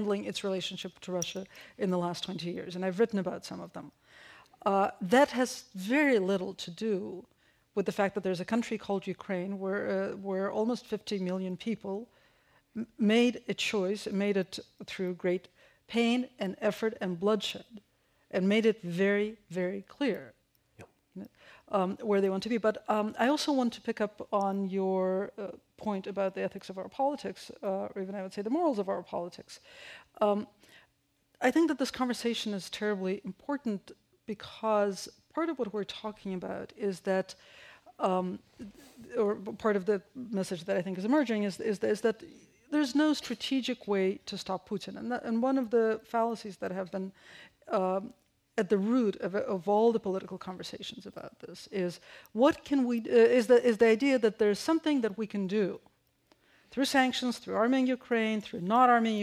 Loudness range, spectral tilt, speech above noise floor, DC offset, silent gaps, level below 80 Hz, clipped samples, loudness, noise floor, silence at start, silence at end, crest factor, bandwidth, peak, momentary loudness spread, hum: 6 LU; -5.5 dB/octave; 42 dB; under 0.1%; none; -72 dBFS; under 0.1%; -31 LUFS; -73 dBFS; 0 s; 0 s; 20 dB; 15.5 kHz; -12 dBFS; 15 LU; none